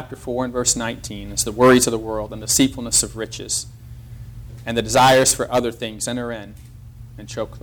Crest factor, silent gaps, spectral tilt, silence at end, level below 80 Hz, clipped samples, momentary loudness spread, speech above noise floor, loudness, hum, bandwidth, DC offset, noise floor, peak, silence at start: 16 dB; none; -3 dB/octave; 0.05 s; -42 dBFS; under 0.1%; 23 LU; 19 dB; -19 LUFS; none; over 20 kHz; under 0.1%; -39 dBFS; -4 dBFS; 0 s